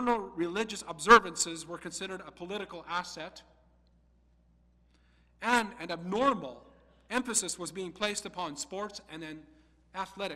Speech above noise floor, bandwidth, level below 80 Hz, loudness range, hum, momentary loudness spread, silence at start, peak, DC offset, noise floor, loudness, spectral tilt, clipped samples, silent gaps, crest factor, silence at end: 34 dB; 16 kHz; -62 dBFS; 12 LU; 60 Hz at -65 dBFS; 16 LU; 0 s; -6 dBFS; under 0.1%; -66 dBFS; -31 LUFS; -2.5 dB/octave; under 0.1%; none; 28 dB; 0 s